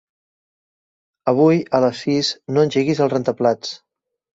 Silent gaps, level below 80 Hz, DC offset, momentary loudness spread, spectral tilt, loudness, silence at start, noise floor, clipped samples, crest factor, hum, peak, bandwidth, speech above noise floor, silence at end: none; -62 dBFS; under 0.1%; 11 LU; -6 dB/octave; -18 LUFS; 1.25 s; under -90 dBFS; under 0.1%; 16 dB; none; -2 dBFS; 8 kHz; over 73 dB; 0.6 s